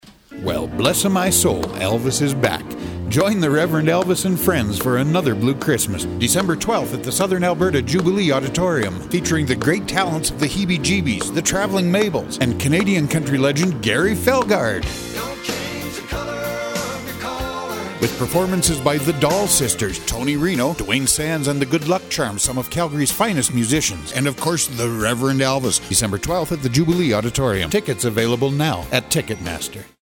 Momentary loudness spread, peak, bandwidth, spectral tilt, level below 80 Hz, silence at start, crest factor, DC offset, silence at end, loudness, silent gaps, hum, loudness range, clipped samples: 8 LU; 0 dBFS; 18 kHz; -4 dB/octave; -40 dBFS; 0.05 s; 18 dB; under 0.1%; 0.15 s; -19 LUFS; none; none; 3 LU; under 0.1%